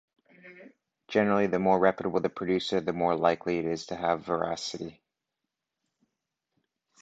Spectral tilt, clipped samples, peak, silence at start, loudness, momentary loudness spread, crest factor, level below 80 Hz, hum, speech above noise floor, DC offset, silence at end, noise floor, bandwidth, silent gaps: -5.5 dB/octave; under 0.1%; -8 dBFS; 0.45 s; -28 LUFS; 8 LU; 22 dB; -64 dBFS; none; 59 dB; under 0.1%; 2.1 s; -86 dBFS; 8.2 kHz; none